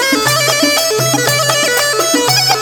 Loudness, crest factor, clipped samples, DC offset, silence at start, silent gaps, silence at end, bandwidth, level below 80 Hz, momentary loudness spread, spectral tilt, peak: -11 LUFS; 12 dB; under 0.1%; under 0.1%; 0 s; none; 0 s; over 20 kHz; -50 dBFS; 2 LU; -2 dB/octave; 0 dBFS